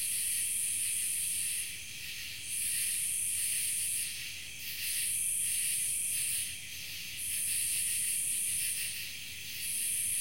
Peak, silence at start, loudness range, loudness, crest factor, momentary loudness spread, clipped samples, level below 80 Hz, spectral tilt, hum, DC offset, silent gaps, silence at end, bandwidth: -20 dBFS; 0 s; 1 LU; -31 LUFS; 14 dB; 9 LU; under 0.1%; -66 dBFS; 2 dB/octave; none; 0.3%; none; 0 s; 16.5 kHz